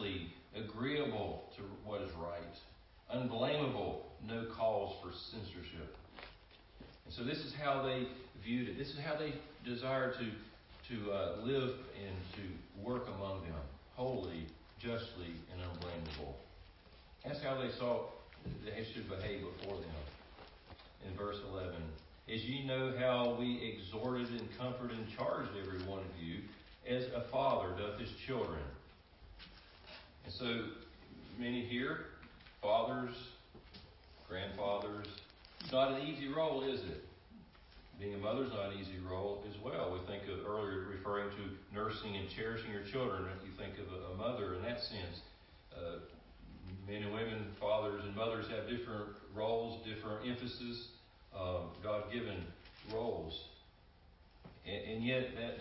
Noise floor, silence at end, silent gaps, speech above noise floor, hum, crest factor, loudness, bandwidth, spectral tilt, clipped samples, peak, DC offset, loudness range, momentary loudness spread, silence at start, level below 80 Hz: -64 dBFS; 0 s; none; 23 dB; none; 20 dB; -42 LUFS; 5.6 kHz; -4 dB/octave; under 0.1%; -22 dBFS; under 0.1%; 5 LU; 19 LU; 0 s; -58 dBFS